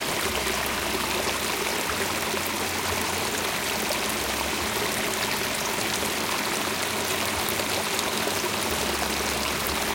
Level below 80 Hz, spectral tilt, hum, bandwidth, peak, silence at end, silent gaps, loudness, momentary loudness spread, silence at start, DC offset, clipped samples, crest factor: -48 dBFS; -2 dB/octave; none; 17 kHz; -8 dBFS; 0 s; none; -25 LUFS; 1 LU; 0 s; under 0.1%; under 0.1%; 20 dB